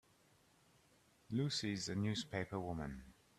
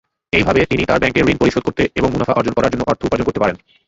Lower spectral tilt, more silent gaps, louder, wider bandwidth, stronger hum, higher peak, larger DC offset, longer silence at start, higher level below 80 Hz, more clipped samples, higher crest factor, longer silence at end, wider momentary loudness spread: about the same, -5 dB/octave vs -6 dB/octave; neither; second, -42 LUFS vs -16 LUFS; first, 13.5 kHz vs 8 kHz; neither; second, -26 dBFS vs 0 dBFS; neither; first, 1.3 s vs 0.35 s; second, -66 dBFS vs -36 dBFS; neither; about the same, 18 dB vs 16 dB; about the same, 0.25 s vs 0.3 s; first, 8 LU vs 4 LU